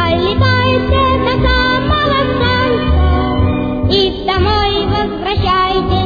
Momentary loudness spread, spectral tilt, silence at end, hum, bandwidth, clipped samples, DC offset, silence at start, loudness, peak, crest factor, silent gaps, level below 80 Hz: 3 LU; -7.5 dB/octave; 0 s; none; 5 kHz; under 0.1%; under 0.1%; 0 s; -13 LUFS; 0 dBFS; 12 dB; none; -20 dBFS